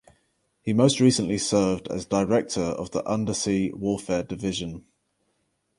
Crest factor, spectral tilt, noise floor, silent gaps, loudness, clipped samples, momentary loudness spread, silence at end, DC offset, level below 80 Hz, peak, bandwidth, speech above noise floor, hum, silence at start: 20 dB; -5 dB/octave; -73 dBFS; none; -24 LUFS; under 0.1%; 9 LU; 1 s; under 0.1%; -52 dBFS; -6 dBFS; 11.5 kHz; 49 dB; none; 0.65 s